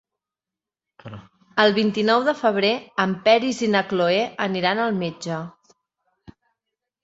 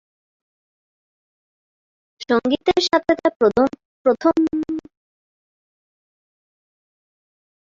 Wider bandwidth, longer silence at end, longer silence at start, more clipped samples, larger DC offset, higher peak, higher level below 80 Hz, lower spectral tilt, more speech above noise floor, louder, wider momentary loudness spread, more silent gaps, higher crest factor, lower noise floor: about the same, 8 kHz vs 7.6 kHz; second, 1.55 s vs 2.9 s; second, 1.05 s vs 2.2 s; neither; neither; about the same, -2 dBFS vs -4 dBFS; second, -64 dBFS vs -58 dBFS; about the same, -5 dB/octave vs -4.5 dB/octave; second, 68 dB vs over 72 dB; about the same, -21 LUFS vs -19 LUFS; first, 13 LU vs 9 LU; second, none vs 3.36-3.40 s, 3.85-4.05 s; about the same, 22 dB vs 20 dB; about the same, -89 dBFS vs under -90 dBFS